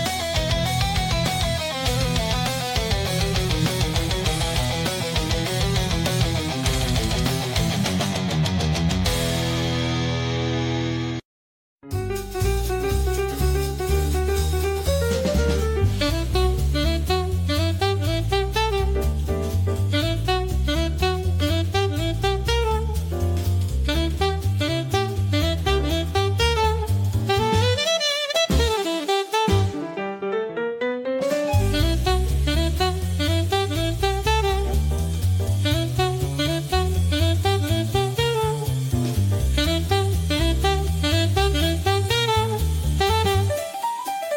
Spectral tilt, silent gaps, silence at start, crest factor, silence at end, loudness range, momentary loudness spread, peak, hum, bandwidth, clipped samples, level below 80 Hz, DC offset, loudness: -5 dB/octave; 11.25-11.78 s; 0 s; 14 dB; 0 s; 2 LU; 4 LU; -6 dBFS; none; 17 kHz; under 0.1%; -28 dBFS; under 0.1%; -22 LUFS